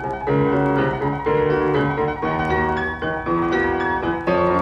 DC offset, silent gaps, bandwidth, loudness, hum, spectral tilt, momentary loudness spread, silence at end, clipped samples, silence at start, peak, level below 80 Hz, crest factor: under 0.1%; none; 8 kHz; -20 LUFS; none; -8 dB/octave; 4 LU; 0 s; under 0.1%; 0 s; -6 dBFS; -40 dBFS; 14 dB